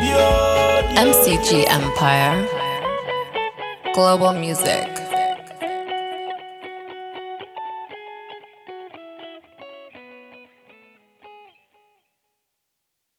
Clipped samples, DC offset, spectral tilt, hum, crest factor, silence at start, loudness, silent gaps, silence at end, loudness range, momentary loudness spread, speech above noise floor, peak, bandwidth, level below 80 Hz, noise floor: under 0.1%; under 0.1%; -3.5 dB/octave; none; 22 dB; 0 s; -18 LUFS; none; 1.85 s; 23 LU; 24 LU; 61 dB; 0 dBFS; 17 kHz; -38 dBFS; -77 dBFS